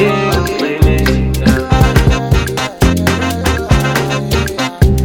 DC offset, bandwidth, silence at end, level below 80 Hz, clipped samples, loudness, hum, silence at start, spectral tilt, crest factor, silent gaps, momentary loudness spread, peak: under 0.1%; over 20 kHz; 0 s; -18 dBFS; 0.1%; -13 LUFS; none; 0 s; -5.5 dB/octave; 12 dB; none; 4 LU; 0 dBFS